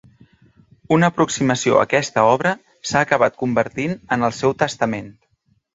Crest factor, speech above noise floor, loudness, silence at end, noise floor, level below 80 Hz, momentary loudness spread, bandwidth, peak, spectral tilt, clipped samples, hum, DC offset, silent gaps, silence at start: 18 dB; 46 dB; -19 LUFS; 0.65 s; -64 dBFS; -54 dBFS; 7 LU; 8 kHz; 0 dBFS; -5 dB/octave; under 0.1%; none; under 0.1%; none; 0.9 s